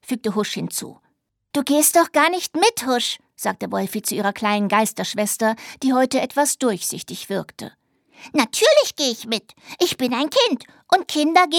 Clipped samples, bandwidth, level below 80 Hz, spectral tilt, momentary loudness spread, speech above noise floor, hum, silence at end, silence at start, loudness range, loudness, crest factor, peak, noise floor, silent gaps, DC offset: under 0.1%; 19 kHz; -68 dBFS; -2.5 dB/octave; 12 LU; 48 dB; none; 0 s; 0.1 s; 3 LU; -20 LUFS; 18 dB; -2 dBFS; -68 dBFS; none; under 0.1%